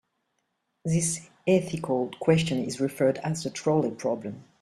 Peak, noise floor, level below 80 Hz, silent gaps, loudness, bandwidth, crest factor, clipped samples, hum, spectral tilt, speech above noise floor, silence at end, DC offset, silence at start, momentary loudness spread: -8 dBFS; -77 dBFS; -62 dBFS; none; -27 LUFS; 13 kHz; 20 dB; under 0.1%; none; -5.5 dB/octave; 51 dB; 0.2 s; under 0.1%; 0.85 s; 7 LU